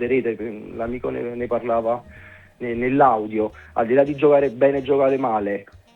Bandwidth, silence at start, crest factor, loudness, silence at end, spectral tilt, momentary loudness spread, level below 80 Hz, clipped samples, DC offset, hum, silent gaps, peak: 4.3 kHz; 0 s; 18 dB; -21 LUFS; 0.35 s; -8.5 dB/octave; 12 LU; -50 dBFS; under 0.1%; under 0.1%; none; none; -2 dBFS